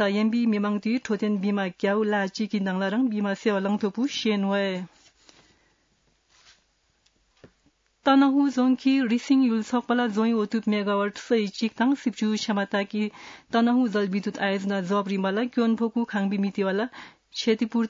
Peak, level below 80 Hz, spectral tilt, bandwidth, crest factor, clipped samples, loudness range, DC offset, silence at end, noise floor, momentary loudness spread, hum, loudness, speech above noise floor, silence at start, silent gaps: -10 dBFS; -72 dBFS; -6 dB/octave; 7.6 kHz; 16 dB; under 0.1%; 6 LU; under 0.1%; 0 s; -68 dBFS; 6 LU; none; -25 LUFS; 44 dB; 0 s; none